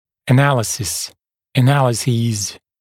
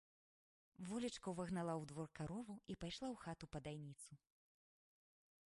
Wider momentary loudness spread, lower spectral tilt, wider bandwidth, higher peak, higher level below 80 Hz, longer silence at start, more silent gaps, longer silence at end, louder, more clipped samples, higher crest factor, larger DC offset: about the same, 10 LU vs 11 LU; about the same, -5 dB/octave vs -5.5 dB/octave; first, 16 kHz vs 11.5 kHz; first, 0 dBFS vs -32 dBFS; first, -52 dBFS vs -72 dBFS; second, 0.25 s vs 0.8 s; neither; second, 0.25 s vs 1.4 s; first, -17 LUFS vs -49 LUFS; neither; about the same, 18 dB vs 18 dB; neither